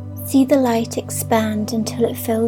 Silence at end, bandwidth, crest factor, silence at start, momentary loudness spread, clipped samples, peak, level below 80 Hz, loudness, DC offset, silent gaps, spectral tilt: 0 s; 18.5 kHz; 16 dB; 0 s; 7 LU; under 0.1%; -4 dBFS; -66 dBFS; -19 LUFS; under 0.1%; none; -5.5 dB/octave